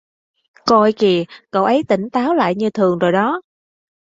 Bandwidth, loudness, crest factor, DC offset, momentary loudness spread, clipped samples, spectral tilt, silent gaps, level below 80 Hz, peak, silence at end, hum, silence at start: 7.8 kHz; -16 LUFS; 16 dB; under 0.1%; 7 LU; under 0.1%; -6.5 dB/octave; none; -58 dBFS; -2 dBFS; 0.75 s; none; 0.65 s